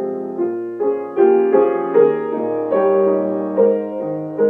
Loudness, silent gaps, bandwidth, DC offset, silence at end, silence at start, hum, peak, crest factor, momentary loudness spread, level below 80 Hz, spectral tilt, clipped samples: -17 LUFS; none; 3.5 kHz; under 0.1%; 0 s; 0 s; none; -2 dBFS; 14 dB; 9 LU; -72 dBFS; -10.5 dB/octave; under 0.1%